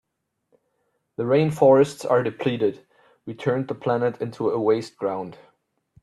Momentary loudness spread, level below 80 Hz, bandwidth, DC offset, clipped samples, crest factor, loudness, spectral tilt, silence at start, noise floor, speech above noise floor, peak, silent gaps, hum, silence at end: 15 LU; -66 dBFS; 12.5 kHz; under 0.1%; under 0.1%; 20 dB; -22 LUFS; -7 dB/octave; 1.2 s; -74 dBFS; 52 dB; -4 dBFS; none; none; 0.7 s